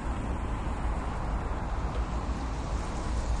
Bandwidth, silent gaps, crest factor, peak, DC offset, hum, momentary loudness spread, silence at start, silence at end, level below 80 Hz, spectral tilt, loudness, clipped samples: 10.5 kHz; none; 12 dB; -20 dBFS; under 0.1%; none; 1 LU; 0 s; 0 s; -32 dBFS; -6.5 dB/octave; -34 LUFS; under 0.1%